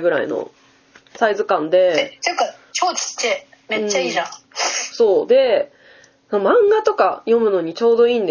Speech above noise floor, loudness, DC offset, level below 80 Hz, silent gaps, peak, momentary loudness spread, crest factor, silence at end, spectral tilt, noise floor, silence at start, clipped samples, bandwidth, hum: 34 dB; -18 LUFS; under 0.1%; -68 dBFS; none; -2 dBFS; 10 LU; 16 dB; 0 s; -2.5 dB/octave; -51 dBFS; 0 s; under 0.1%; 7.2 kHz; none